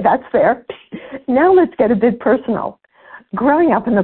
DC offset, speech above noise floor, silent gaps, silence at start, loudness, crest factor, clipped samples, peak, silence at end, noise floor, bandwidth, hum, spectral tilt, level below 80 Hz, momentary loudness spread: under 0.1%; 28 dB; none; 0 s; -15 LUFS; 14 dB; under 0.1%; -2 dBFS; 0 s; -42 dBFS; 4.3 kHz; none; -12.5 dB/octave; -50 dBFS; 16 LU